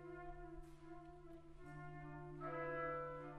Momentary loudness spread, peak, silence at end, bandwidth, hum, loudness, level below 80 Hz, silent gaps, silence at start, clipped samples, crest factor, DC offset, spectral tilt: 14 LU; -36 dBFS; 0 s; 11.5 kHz; none; -51 LUFS; -62 dBFS; none; 0 s; under 0.1%; 16 dB; under 0.1%; -8 dB/octave